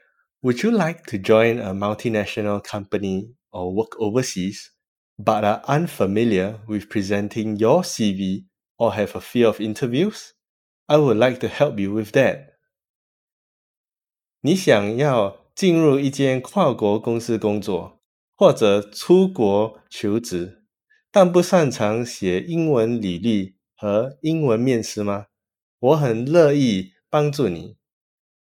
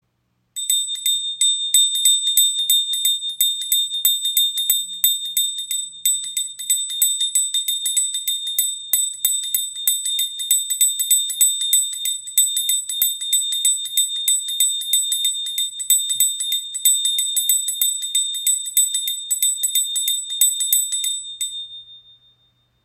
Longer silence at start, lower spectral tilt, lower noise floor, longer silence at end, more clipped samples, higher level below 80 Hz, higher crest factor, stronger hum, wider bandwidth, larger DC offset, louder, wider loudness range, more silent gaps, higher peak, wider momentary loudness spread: about the same, 0.45 s vs 0.55 s; first, -6 dB/octave vs 5.5 dB/octave; first, under -90 dBFS vs -69 dBFS; about the same, 0.75 s vs 0.85 s; neither; first, -64 dBFS vs -74 dBFS; about the same, 20 dB vs 20 dB; neither; about the same, 17 kHz vs 17 kHz; neither; second, -20 LUFS vs -17 LUFS; about the same, 4 LU vs 3 LU; first, 4.88-5.16 s, 8.70-8.75 s, 10.49-10.86 s, 12.89-13.84 s, 18.05-18.33 s, 25.62-25.78 s vs none; about the same, 0 dBFS vs 0 dBFS; first, 11 LU vs 7 LU